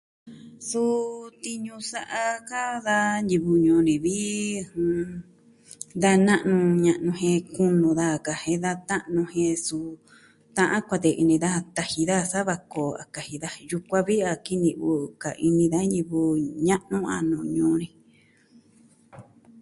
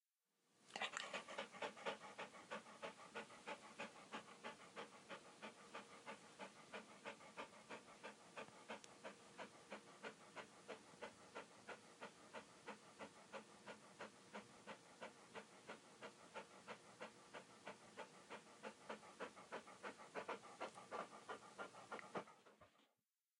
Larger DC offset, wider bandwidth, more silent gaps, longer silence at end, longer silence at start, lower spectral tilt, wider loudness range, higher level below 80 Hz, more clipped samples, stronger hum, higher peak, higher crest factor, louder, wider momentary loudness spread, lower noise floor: neither; about the same, 11.5 kHz vs 11 kHz; neither; second, 0.4 s vs 0.55 s; second, 0.25 s vs 0.5 s; first, -5.5 dB/octave vs -2.5 dB/octave; about the same, 4 LU vs 6 LU; first, -60 dBFS vs under -90 dBFS; neither; neither; first, -6 dBFS vs -28 dBFS; second, 18 dB vs 30 dB; first, -24 LUFS vs -56 LUFS; first, 13 LU vs 8 LU; second, -59 dBFS vs under -90 dBFS